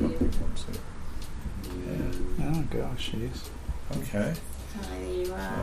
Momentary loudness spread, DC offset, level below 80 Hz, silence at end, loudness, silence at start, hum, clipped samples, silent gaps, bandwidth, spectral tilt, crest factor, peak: 9 LU; under 0.1%; -34 dBFS; 0 s; -34 LUFS; 0 s; none; under 0.1%; none; 15 kHz; -6 dB/octave; 16 dB; -14 dBFS